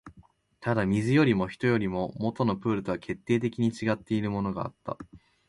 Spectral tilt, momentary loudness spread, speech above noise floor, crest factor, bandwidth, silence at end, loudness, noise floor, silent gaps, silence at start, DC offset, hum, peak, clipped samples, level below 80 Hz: -7.5 dB/octave; 12 LU; 31 dB; 18 dB; 11.5 kHz; 0.3 s; -28 LUFS; -59 dBFS; none; 0.05 s; under 0.1%; none; -10 dBFS; under 0.1%; -56 dBFS